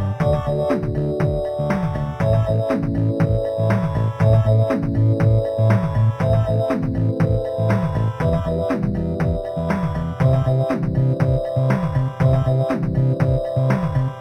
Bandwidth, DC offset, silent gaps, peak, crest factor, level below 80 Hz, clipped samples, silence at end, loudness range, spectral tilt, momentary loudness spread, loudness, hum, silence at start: 8.6 kHz; under 0.1%; none; -4 dBFS; 14 dB; -34 dBFS; under 0.1%; 0 s; 3 LU; -9.5 dB/octave; 5 LU; -20 LUFS; none; 0 s